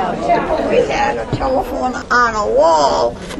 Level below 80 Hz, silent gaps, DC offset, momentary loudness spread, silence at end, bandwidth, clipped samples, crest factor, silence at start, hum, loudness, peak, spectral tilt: -34 dBFS; none; under 0.1%; 6 LU; 0 s; 13.5 kHz; under 0.1%; 14 dB; 0 s; none; -15 LUFS; 0 dBFS; -4.5 dB/octave